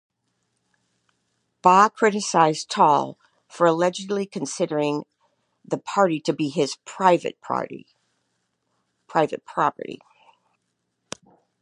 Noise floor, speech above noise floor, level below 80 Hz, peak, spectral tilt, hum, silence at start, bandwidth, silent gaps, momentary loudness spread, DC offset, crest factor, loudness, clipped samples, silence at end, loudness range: -76 dBFS; 54 dB; -76 dBFS; -2 dBFS; -4.5 dB/octave; none; 1.65 s; 11 kHz; none; 18 LU; under 0.1%; 22 dB; -22 LUFS; under 0.1%; 1.65 s; 9 LU